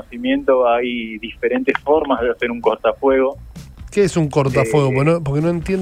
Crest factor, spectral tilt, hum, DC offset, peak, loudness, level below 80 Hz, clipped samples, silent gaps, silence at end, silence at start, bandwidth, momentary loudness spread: 16 dB; -6.5 dB/octave; none; under 0.1%; -2 dBFS; -17 LUFS; -40 dBFS; under 0.1%; none; 0 s; 0.1 s; 14.5 kHz; 8 LU